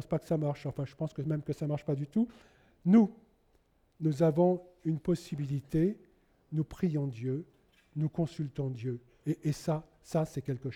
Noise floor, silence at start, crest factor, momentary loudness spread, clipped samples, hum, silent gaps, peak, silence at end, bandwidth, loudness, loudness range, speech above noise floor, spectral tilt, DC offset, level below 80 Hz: -69 dBFS; 0 s; 18 dB; 11 LU; under 0.1%; none; none; -14 dBFS; 0 s; 13.5 kHz; -33 LUFS; 5 LU; 38 dB; -8.5 dB/octave; under 0.1%; -60 dBFS